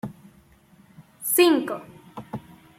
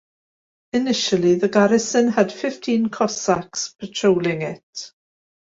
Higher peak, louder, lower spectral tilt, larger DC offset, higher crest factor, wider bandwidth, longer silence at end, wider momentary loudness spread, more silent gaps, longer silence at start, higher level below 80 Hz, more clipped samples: second, -6 dBFS vs -2 dBFS; about the same, -21 LUFS vs -20 LUFS; about the same, -3.5 dB/octave vs -4.5 dB/octave; neither; about the same, 20 dB vs 18 dB; first, 16.5 kHz vs 8 kHz; second, 0.4 s vs 0.7 s; first, 23 LU vs 12 LU; second, none vs 4.63-4.73 s; second, 0.05 s vs 0.75 s; about the same, -64 dBFS vs -60 dBFS; neither